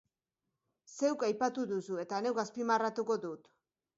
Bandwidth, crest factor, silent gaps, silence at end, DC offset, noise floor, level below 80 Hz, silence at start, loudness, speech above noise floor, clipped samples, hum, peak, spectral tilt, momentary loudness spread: 7.6 kHz; 18 dB; none; 0.6 s; under 0.1%; -89 dBFS; -84 dBFS; 0.9 s; -35 LUFS; 55 dB; under 0.1%; none; -18 dBFS; -4 dB/octave; 8 LU